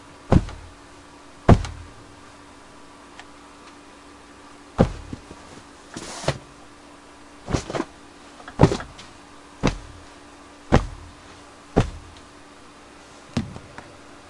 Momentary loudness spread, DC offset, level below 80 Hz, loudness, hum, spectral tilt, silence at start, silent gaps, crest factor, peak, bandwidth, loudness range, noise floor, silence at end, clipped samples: 25 LU; under 0.1%; -36 dBFS; -24 LUFS; none; -6.5 dB/octave; 0.3 s; none; 26 dB; 0 dBFS; 11.5 kHz; 6 LU; -46 dBFS; 0.65 s; under 0.1%